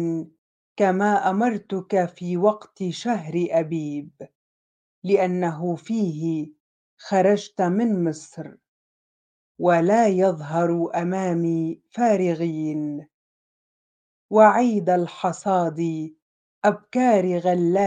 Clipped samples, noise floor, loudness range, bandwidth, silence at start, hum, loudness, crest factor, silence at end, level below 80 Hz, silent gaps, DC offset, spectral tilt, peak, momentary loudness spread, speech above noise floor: under 0.1%; under -90 dBFS; 4 LU; 9.4 kHz; 0 s; none; -22 LUFS; 20 dB; 0 s; -72 dBFS; 0.38-0.76 s, 4.35-5.02 s, 6.60-6.97 s, 8.68-9.55 s, 13.14-14.29 s, 16.22-16.62 s; under 0.1%; -7 dB/octave; -2 dBFS; 13 LU; over 69 dB